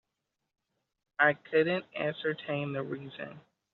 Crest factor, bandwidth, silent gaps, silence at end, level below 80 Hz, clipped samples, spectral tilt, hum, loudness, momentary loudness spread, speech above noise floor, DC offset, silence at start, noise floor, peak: 24 dB; 4.7 kHz; none; 0.35 s; -78 dBFS; under 0.1%; -3.5 dB/octave; none; -31 LUFS; 16 LU; 54 dB; under 0.1%; 1.2 s; -85 dBFS; -10 dBFS